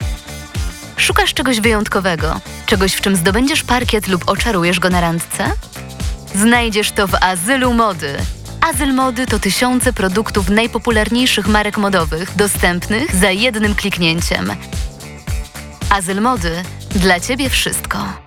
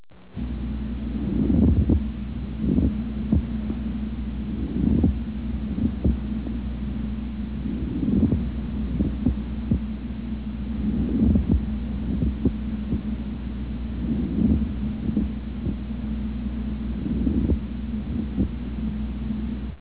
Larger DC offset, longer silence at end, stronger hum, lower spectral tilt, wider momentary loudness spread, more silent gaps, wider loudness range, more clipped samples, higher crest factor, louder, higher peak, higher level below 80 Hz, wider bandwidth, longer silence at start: second, 0.1% vs 0.4%; about the same, 0.05 s vs 0 s; neither; second, -4 dB/octave vs -12.5 dB/octave; first, 12 LU vs 9 LU; neither; about the same, 3 LU vs 3 LU; neither; about the same, 16 dB vs 18 dB; first, -15 LUFS vs -26 LUFS; first, 0 dBFS vs -6 dBFS; about the same, -28 dBFS vs -30 dBFS; first, 19 kHz vs 4 kHz; about the same, 0 s vs 0 s